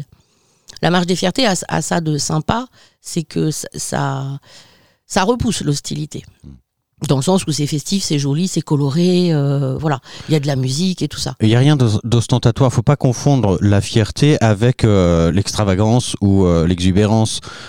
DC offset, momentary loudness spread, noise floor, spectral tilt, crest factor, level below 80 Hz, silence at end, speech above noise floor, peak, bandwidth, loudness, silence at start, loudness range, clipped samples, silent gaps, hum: 1%; 9 LU; -57 dBFS; -5.5 dB/octave; 16 dB; -38 dBFS; 0 s; 42 dB; 0 dBFS; 16 kHz; -16 LUFS; 0 s; 7 LU; under 0.1%; none; none